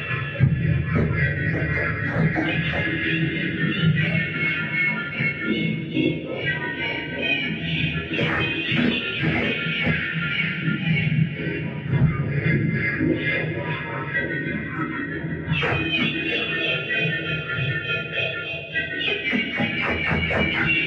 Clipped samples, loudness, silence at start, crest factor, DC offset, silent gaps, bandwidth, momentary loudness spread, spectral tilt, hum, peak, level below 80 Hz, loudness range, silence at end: under 0.1%; -23 LUFS; 0 s; 16 dB; under 0.1%; none; 6.2 kHz; 5 LU; -7.5 dB/octave; none; -6 dBFS; -42 dBFS; 2 LU; 0 s